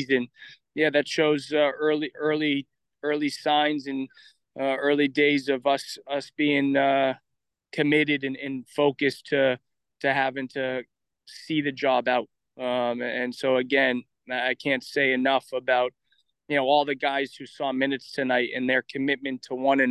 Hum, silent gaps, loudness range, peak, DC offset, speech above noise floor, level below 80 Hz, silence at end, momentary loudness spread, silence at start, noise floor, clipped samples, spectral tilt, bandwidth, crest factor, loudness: none; none; 3 LU; -8 dBFS; under 0.1%; 27 dB; -76 dBFS; 0 s; 10 LU; 0 s; -52 dBFS; under 0.1%; -5 dB/octave; 12.5 kHz; 18 dB; -25 LUFS